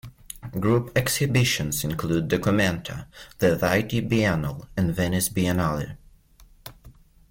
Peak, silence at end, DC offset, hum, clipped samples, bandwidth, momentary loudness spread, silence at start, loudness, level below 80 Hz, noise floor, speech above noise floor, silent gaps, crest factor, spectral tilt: -8 dBFS; 0.4 s; under 0.1%; none; under 0.1%; 17 kHz; 18 LU; 0.05 s; -24 LUFS; -46 dBFS; -54 dBFS; 30 dB; none; 16 dB; -5 dB/octave